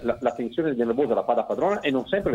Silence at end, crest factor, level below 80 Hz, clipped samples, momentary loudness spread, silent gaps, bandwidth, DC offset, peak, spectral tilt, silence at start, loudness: 0 s; 16 dB; -54 dBFS; under 0.1%; 4 LU; none; 10 kHz; under 0.1%; -8 dBFS; -7 dB/octave; 0 s; -25 LUFS